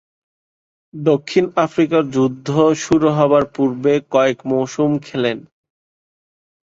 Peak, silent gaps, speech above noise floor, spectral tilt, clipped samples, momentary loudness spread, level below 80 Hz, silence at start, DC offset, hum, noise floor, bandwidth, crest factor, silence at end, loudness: -2 dBFS; none; over 74 dB; -6.5 dB/octave; under 0.1%; 6 LU; -56 dBFS; 0.95 s; under 0.1%; none; under -90 dBFS; 7.8 kHz; 16 dB; 1.2 s; -17 LUFS